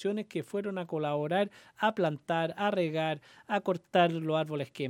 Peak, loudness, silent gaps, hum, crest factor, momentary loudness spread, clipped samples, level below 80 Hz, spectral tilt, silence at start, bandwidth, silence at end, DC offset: -10 dBFS; -31 LUFS; none; none; 20 dB; 8 LU; under 0.1%; -80 dBFS; -6.5 dB/octave; 0 s; 16 kHz; 0 s; under 0.1%